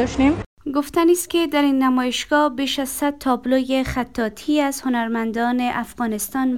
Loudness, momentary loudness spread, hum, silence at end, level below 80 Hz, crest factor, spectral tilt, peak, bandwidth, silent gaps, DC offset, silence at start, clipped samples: -20 LUFS; 7 LU; none; 0 s; -44 dBFS; 16 dB; -4 dB/octave; -4 dBFS; 17.5 kHz; 0.46-0.57 s; 0.3%; 0 s; under 0.1%